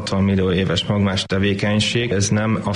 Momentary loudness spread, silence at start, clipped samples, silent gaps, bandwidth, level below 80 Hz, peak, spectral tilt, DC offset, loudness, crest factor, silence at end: 2 LU; 0 s; under 0.1%; none; 11 kHz; -44 dBFS; -6 dBFS; -5 dB/octave; under 0.1%; -19 LUFS; 12 dB; 0 s